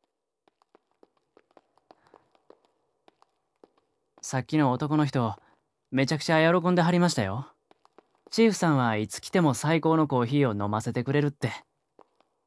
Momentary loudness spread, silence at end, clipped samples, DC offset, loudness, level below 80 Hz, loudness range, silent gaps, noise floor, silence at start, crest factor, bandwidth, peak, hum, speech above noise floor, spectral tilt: 11 LU; 0.85 s; under 0.1%; under 0.1%; -26 LUFS; -70 dBFS; 6 LU; none; -73 dBFS; 4.25 s; 20 dB; 11 kHz; -8 dBFS; none; 48 dB; -6 dB/octave